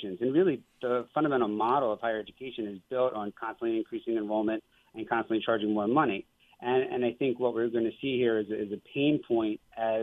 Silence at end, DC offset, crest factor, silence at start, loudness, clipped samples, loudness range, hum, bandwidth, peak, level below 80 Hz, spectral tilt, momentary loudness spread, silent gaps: 0 s; under 0.1%; 18 dB; 0 s; -30 LUFS; under 0.1%; 3 LU; none; 3.9 kHz; -12 dBFS; -70 dBFS; -8.5 dB/octave; 10 LU; none